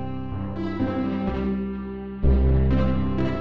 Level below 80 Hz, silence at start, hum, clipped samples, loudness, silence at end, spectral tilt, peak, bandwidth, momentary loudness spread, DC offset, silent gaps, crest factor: -28 dBFS; 0 s; none; under 0.1%; -25 LUFS; 0 s; -10 dB/octave; -10 dBFS; 5 kHz; 10 LU; under 0.1%; none; 12 dB